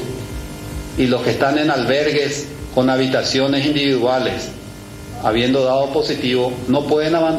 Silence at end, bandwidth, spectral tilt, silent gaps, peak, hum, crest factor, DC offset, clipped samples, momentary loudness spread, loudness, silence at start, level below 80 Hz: 0 s; 15 kHz; -5 dB/octave; none; -2 dBFS; none; 16 dB; under 0.1%; under 0.1%; 14 LU; -17 LUFS; 0 s; -40 dBFS